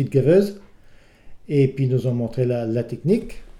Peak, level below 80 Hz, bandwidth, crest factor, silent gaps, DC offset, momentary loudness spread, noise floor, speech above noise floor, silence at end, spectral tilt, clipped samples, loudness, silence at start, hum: -4 dBFS; -46 dBFS; 12.5 kHz; 16 dB; none; under 0.1%; 8 LU; -48 dBFS; 28 dB; 0 s; -9 dB/octave; under 0.1%; -21 LUFS; 0 s; none